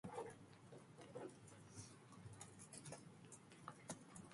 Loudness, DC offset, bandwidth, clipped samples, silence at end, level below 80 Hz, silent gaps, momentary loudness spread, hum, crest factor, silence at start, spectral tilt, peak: -58 LUFS; under 0.1%; 11.5 kHz; under 0.1%; 0 s; -82 dBFS; none; 7 LU; none; 22 dB; 0.05 s; -4.5 dB/octave; -36 dBFS